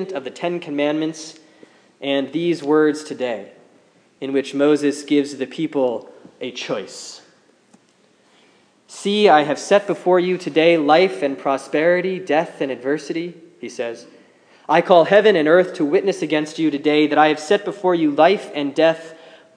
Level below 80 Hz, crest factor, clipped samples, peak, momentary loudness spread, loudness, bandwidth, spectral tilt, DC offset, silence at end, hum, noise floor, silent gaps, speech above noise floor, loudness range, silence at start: -82 dBFS; 18 dB; under 0.1%; 0 dBFS; 16 LU; -18 LUFS; 10.5 kHz; -5 dB/octave; under 0.1%; 0.4 s; none; -57 dBFS; none; 39 dB; 7 LU; 0 s